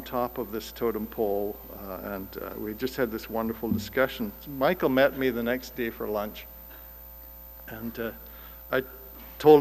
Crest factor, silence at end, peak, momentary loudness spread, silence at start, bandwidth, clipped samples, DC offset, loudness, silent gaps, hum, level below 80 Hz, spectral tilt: 22 dB; 0 s; -6 dBFS; 19 LU; 0 s; 15.5 kHz; under 0.1%; under 0.1%; -29 LUFS; none; none; -50 dBFS; -6 dB/octave